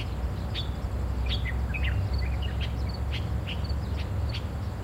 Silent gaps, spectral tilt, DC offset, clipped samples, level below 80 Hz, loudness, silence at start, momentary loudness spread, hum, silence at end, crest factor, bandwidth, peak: none; -6.5 dB/octave; under 0.1%; under 0.1%; -32 dBFS; -31 LUFS; 0 s; 4 LU; none; 0 s; 12 dB; 12 kHz; -18 dBFS